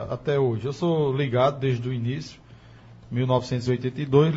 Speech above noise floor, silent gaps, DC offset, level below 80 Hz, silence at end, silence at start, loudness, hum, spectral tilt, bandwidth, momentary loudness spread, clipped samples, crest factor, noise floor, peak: 24 dB; none; under 0.1%; -54 dBFS; 0 s; 0 s; -25 LUFS; none; -7.5 dB/octave; 7.8 kHz; 8 LU; under 0.1%; 20 dB; -48 dBFS; -6 dBFS